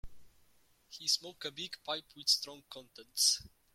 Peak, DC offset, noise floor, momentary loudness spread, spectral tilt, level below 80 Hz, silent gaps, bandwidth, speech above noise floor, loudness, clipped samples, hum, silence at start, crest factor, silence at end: -14 dBFS; under 0.1%; -70 dBFS; 21 LU; 0.5 dB/octave; -62 dBFS; none; 16.5 kHz; 33 dB; -33 LUFS; under 0.1%; none; 0.05 s; 24 dB; 0.25 s